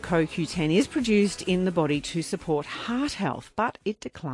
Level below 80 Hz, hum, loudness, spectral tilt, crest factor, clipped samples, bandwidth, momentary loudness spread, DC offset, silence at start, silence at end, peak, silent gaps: -52 dBFS; none; -26 LUFS; -5.5 dB/octave; 16 dB; under 0.1%; 11.5 kHz; 7 LU; under 0.1%; 0 s; 0 s; -10 dBFS; none